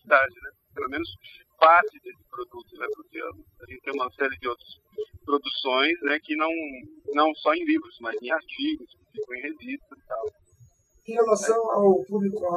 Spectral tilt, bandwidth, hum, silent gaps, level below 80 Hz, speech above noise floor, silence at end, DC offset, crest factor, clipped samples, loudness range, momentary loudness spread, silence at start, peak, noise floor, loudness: -4 dB/octave; 13.5 kHz; none; none; -64 dBFS; 32 dB; 0 s; under 0.1%; 22 dB; under 0.1%; 7 LU; 18 LU; 0.05 s; -4 dBFS; -58 dBFS; -25 LUFS